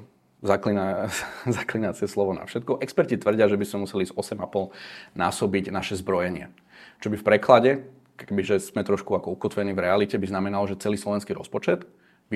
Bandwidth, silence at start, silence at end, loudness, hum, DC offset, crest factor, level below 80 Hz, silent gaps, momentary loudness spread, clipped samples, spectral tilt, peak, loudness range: 15 kHz; 0 s; 0 s; -25 LUFS; none; under 0.1%; 24 dB; -64 dBFS; none; 9 LU; under 0.1%; -5.5 dB/octave; 0 dBFS; 3 LU